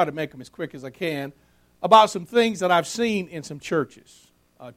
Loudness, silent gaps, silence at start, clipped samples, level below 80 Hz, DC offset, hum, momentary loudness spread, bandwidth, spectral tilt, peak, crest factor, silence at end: -22 LUFS; none; 0 s; under 0.1%; -64 dBFS; under 0.1%; none; 19 LU; 16 kHz; -4.5 dB/octave; -2 dBFS; 22 dB; 0.05 s